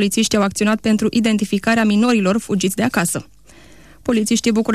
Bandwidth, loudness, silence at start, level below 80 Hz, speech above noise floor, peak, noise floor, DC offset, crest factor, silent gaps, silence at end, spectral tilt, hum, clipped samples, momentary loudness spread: 14 kHz; -17 LUFS; 0 s; -48 dBFS; 29 dB; -6 dBFS; -46 dBFS; 0.4%; 12 dB; none; 0 s; -4.5 dB/octave; none; under 0.1%; 5 LU